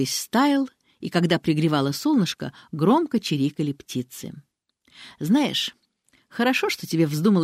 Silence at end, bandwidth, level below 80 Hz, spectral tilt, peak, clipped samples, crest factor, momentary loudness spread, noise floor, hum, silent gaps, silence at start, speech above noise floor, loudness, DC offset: 0 s; 16 kHz; -66 dBFS; -5 dB/octave; -6 dBFS; under 0.1%; 18 dB; 13 LU; -64 dBFS; none; none; 0 s; 42 dB; -23 LUFS; under 0.1%